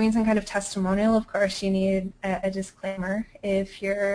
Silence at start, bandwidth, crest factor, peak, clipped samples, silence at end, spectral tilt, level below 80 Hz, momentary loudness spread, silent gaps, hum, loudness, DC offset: 0 s; 10.5 kHz; 14 dB; -10 dBFS; under 0.1%; 0 s; -5.5 dB/octave; -48 dBFS; 8 LU; none; none; -26 LUFS; under 0.1%